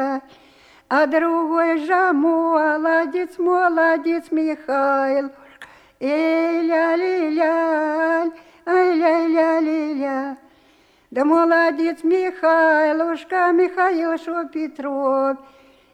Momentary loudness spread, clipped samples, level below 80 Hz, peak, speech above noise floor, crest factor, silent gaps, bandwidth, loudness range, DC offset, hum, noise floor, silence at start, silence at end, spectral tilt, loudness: 9 LU; under 0.1%; -68 dBFS; -6 dBFS; 37 dB; 14 dB; none; 8.8 kHz; 3 LU; under 0.1%; none; -55 dBFS; 0 s; 0.55 s; -4.5 dB/octave; -19 LUFS